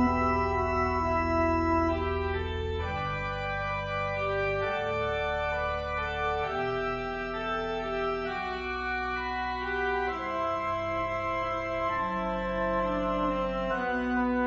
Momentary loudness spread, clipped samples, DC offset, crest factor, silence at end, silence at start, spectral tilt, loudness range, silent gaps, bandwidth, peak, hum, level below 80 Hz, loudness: 5 LU; under 0.1%; under 0.1%; 14 dB; 0 s; 0 s; -7 dB/octave; 2 LU; none; 7.6 kHz; -14 dBFS; none; -42 dBFS; -30 LUFS